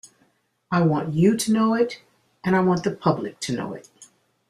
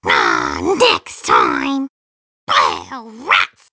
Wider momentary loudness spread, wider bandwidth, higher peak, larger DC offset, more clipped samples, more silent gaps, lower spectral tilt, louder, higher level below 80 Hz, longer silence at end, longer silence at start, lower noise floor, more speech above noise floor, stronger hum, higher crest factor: second, 11 LU vs 15 LU; first, 14.5 kHz vs 8 kHz; second, -4 dBFS vs 0 dBFS; neither; neither; second, none vs 1.89-2.47 s; first, -6 dB/octave vs -2.5 dB/octave; second, -22 LUFS vs -15 LUFS; second, -60 dBFS vs -46 dBFS; first, 0.45 s vs 0.25 s; about the same, 0.05 s vs 0.05 s; second, -65 dBFS vs under -90 dBFS; second, 44 dB vs over 75 dB; neither; about the same, 20 dB vs 16 dB